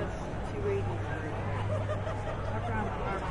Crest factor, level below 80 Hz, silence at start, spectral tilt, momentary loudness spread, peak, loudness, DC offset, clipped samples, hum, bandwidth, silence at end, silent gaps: 12 dB; -42 dBFS; 0 s; -7.5 dB/octave; 3 LU; -20 dBFS; -34 LUFS; under 0.1%; under 0.1%; none; 10.5 kHz; 0 s; none